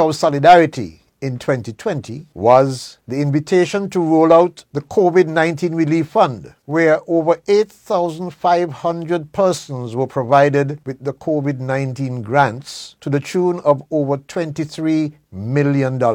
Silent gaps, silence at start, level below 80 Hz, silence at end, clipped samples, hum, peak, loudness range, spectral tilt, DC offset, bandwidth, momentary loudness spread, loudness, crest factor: none; 0 s; -56 dBFS; 0 s; under 0.1%; none; 0 dBFS; 4 LU; -6.5 dB/octave; under 0.1%; 15.5 kHz; 13 LU; -17 LUFS; 16 dB